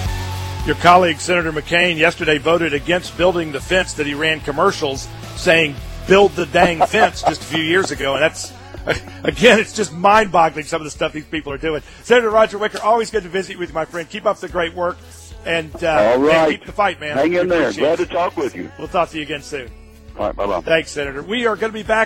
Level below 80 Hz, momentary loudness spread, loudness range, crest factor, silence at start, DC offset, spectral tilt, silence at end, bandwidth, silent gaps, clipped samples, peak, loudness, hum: -38 dBFS; 12 LU; 5 LU; 18 dB; 0 s; under 0.1%; -4.5 dB/octave; 0 s; 16.5 kHz; none; under 0.1%; 0 dBFS; -17 LUFS; none